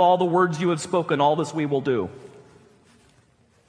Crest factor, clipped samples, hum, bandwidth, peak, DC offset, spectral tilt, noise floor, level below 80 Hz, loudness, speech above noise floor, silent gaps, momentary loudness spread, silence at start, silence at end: 16 dB; under 0.1%; none; 10.5 kHz; -6 dBFS; under 0.1%; -6 dB/octave; -60 dBFS; -66 dBFS; -22 LUFS; 38 dB; none; 6 LU; 0 s; 1.4 s